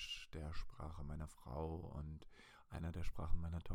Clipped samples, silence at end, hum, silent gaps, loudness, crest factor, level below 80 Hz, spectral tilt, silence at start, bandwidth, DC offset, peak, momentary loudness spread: under 0.1%; 0 s; none; none; -50 LUFS; 20 dB; -50 dBFS; -6 dB/octave; 0 s; 10.5 kHz; under 0.1%; -24 dBFS; 8 LU